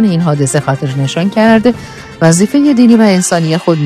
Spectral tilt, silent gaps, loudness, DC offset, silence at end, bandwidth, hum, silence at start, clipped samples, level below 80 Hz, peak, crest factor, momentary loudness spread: -5.5 dB/octave; none; -10 LUFS; under 0.1%; 0 s; 14 kHz; none; 0 s; 0.5%; -46 dBFS; 0 dBFS; 10 dB; 8 LU